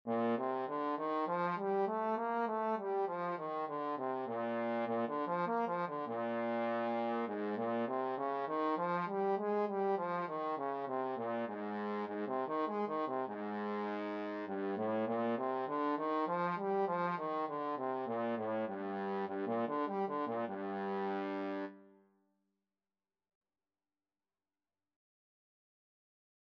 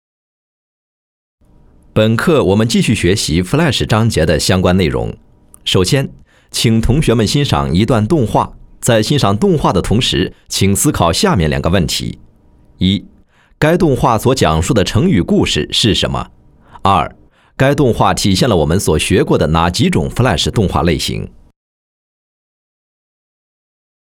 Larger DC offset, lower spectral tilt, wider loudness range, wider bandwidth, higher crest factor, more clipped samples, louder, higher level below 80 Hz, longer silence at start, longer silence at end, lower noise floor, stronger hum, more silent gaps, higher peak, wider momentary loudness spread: neither; about the same, -5 dB/octave vs -5 dB/octave; about the same, 3 LU vs 3 LU; second, 6.2 kHz vs 17.5 kHz; about the same, 14 dB vs 14 dB; neither; second, -37 LUFS vs -13 LUFS; second, under -90 dBFS vs -30 dBFS; second, 0.05 s vs 1.95 s; first, 4.65 s vs 2.8 s; first, under -90 dBFS vs -46 dBFS; neither; neither; second, -22 dBFS vs 0 dBFS; second, 4 LU vs 7 LU